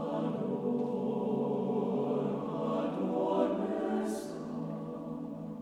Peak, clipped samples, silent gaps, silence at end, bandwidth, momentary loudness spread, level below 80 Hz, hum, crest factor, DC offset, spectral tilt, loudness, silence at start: -16 dBFS; under 0.1%; none; 0 s; 13 kHz; 9 LU; -70 dBFS; none; 16 dB; under 0.1%; -8 dB/octave; -34 LUFS; 0 s